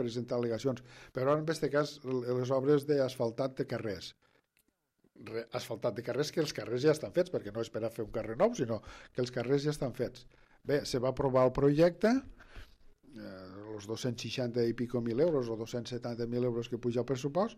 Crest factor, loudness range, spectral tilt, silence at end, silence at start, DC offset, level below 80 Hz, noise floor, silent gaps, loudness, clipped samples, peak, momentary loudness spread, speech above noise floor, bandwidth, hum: 18 dB; 5 LU; -6.5 dB/octave; 0 s; 0 s; under 0.1%; -60 dBFS; -76 dBFS; none; -33 LUFS; under 0.1%; -16 dBFS; 13 LU; 44 dB; 15 kHz; none